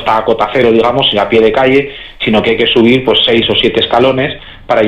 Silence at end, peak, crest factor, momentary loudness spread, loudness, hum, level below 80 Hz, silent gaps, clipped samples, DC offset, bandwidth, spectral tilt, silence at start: 0 s; 0 dBFS; 10 dB; 7 LU; -10 LUFS; none; -38 dBFS; none; under 0.1%; under 0.1%; 8.8 kHz; -6 dB/octave; 0 s